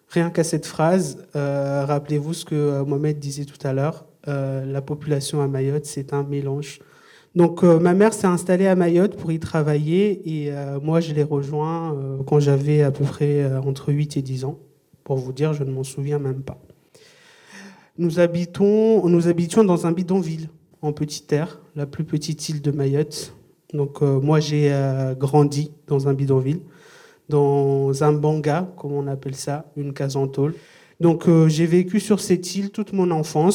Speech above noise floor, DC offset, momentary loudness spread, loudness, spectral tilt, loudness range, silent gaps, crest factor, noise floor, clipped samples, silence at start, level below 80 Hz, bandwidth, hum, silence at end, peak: 32 dB; under 0.1%; 11 LU; -21 LUFS; -7 dB/octave; 6 LU; none; 18 dB; -52 dBFS; under 0.1%; 0.1 s; -60 dBFS; 14 kHz; none; 0 s; -2 dBFS